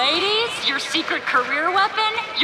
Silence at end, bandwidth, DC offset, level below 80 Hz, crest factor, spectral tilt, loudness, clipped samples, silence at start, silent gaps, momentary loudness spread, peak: 0 s; 15.5 kHz; under 0.1%; -64 dBFS; 14 dB; -1.5 dB/octave; -19 LUFS; under 0.1%; 0 s; none; 3 LU; -6 dBFS